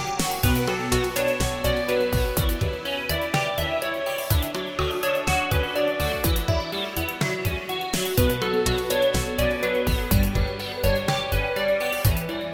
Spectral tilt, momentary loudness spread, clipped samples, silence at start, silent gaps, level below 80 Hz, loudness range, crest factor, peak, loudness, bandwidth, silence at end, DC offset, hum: -4.5 dB/octave; 5 LU; under 0.1%; 0 s; none; -32 dBFS; 1 LU; 16 dB; -8 dBFS; -24 LUFS; 17.5 kHz; 0 s; under 0.1%; none